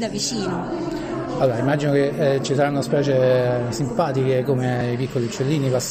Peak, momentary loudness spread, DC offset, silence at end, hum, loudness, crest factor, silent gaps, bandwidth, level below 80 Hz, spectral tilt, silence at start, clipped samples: -6 dBFS; 8 LU; under 0.1%; 0 s; none; -21 LUFS; 14 dB; none; 15.5 kHz; -48 dBFS; -6 dB/octave; 0 s; under 0.1%